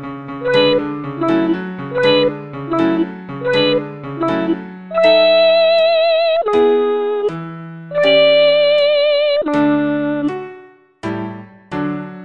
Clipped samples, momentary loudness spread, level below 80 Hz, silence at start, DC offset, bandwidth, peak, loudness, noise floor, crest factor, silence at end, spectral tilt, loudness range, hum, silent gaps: under 0.1%; 15 LU; -54 dBFS; 0 s; 0.2%; 8.8 kHz; -2 dBFS; -15 LUFS; -41 dBFS; 14 dB; 0 s; -6.5 dB/octave; 4 LU; none; none